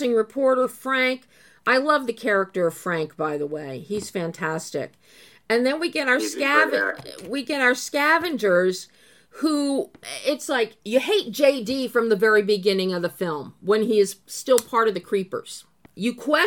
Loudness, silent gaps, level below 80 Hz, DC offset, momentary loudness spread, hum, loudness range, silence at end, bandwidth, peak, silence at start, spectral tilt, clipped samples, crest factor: -22 LUFS; none; -70 dBFS; under 0.1%; 11 LU; none; 4 LU; 0 s; 17.5 kHz; -2 dBFS; 0 s; -4 dB/octave; under 0.1%; 20 dB